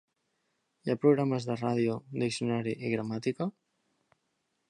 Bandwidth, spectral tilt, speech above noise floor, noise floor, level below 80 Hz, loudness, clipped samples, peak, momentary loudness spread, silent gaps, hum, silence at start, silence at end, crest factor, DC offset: 11 kHz; -6.5 dB/octave; 49 dB; -79 dBFS; -74 dBFS; -31 LUFS; under 0.1%; -12 dBFS; 9 LU; none; none; 0.85 s; 1.2 s; 20 dB; under 0.1%